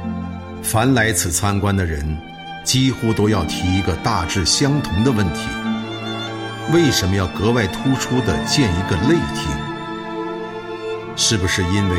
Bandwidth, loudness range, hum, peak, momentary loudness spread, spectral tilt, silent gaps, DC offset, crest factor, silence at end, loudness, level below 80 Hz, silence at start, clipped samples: 16.5 kHz; 2 LU; none; -4 dBFS; 11 LU; -4.5 dB/octave; none; under 0.1%; 14 dB; 0 s; -19 LUFS; -38 dBFS; 0 s; under 0.1%